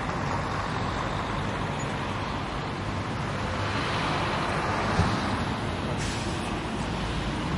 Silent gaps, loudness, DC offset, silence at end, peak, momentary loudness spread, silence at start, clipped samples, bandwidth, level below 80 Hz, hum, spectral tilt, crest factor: none; -29 LUFS; under 0.1%; 0 s; -10 dBFS; 5 LU; 0 s; under 0.1%; 11.5 kHz; -40 dBFS; none; -5.5 dB/octave; 18 dB